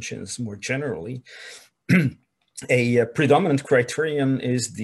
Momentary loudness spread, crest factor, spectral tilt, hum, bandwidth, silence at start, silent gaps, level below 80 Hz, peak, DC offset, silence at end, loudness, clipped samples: 21 LU; 18 dB; -5.5 dB/octave; none; 12.5 kHz; 0 s; none; -64 dBFS; -4 dBFS; under 0.1%; 0 s; -22 LUFS; under 0.1%